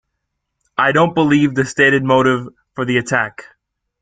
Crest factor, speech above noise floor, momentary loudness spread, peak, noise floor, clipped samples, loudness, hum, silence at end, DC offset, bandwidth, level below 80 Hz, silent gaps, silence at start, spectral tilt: 16 dB; 59 dB; 12 LU; 0 dBFS; -75 dBFS; under 0.1%; -15 LUFS; none; 0.6 s; under 0.1%; 9.4 kHz; -54 dBFS; none; 0.8 s; -5.5 dB/octave